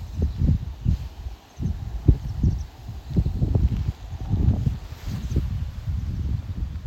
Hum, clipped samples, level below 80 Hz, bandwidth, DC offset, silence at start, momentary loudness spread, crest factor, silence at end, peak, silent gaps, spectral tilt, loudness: none; under 0.1%; -28 dBFS; 13.5 kHz; under 0.1%; 0 s; 11 LU; 20 dB; 0 s; -4 dBFS; none; -8.5 dB/octave; -26 LUFS